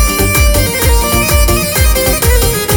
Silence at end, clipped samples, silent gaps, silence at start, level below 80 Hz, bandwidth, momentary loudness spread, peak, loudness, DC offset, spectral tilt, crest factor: 0 s; under 0.1%; none; 0 s; -14 dBFS; over 20 kHz; 1 LU; 0 dBFS; -10 LUFS; under 0.1%; -3.5 dB/octave; 10 dB